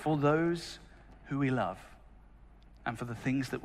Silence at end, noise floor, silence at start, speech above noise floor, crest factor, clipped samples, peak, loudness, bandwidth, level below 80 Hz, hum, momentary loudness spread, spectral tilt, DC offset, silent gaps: 0 s; -56 dBFS; 0 s; 24 dB; 18 dB; under 0.1%; -16 dBFS; -33 LUFS; 14 kHz; -56 dBFS; none; 15 LU; -7 dB/octave; under 0.1%; none